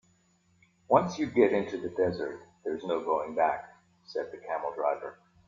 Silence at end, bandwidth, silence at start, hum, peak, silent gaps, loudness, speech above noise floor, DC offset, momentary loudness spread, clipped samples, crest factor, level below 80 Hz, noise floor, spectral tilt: 0.35 s; 7.4 kHz; 0.9 s; none; -8 dBFS; none; -30 LUFS; 39 dB; under 0.1%; 13 LU; under 0.1%; 24 dB; -68 dBFS; -68 dBFS; -6.5 dB/octave